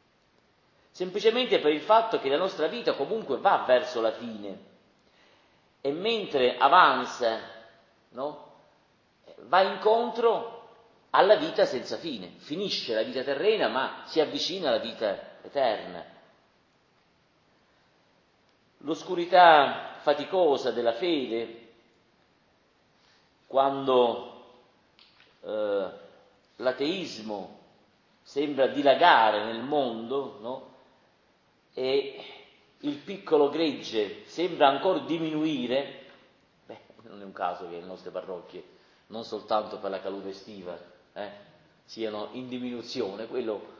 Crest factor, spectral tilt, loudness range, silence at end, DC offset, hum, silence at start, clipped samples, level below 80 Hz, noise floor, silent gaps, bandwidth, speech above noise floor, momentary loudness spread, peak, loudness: 24 dB; -4.5 dB/octave; 11 LU; 0.05 s; under 0.1%; none; 0.95 s; under 0.1%; -76 dBFS; -66 dBFS; none; 7.4 kHz; 39 dB; 19 LU; -4 dBFS; -26 LUFS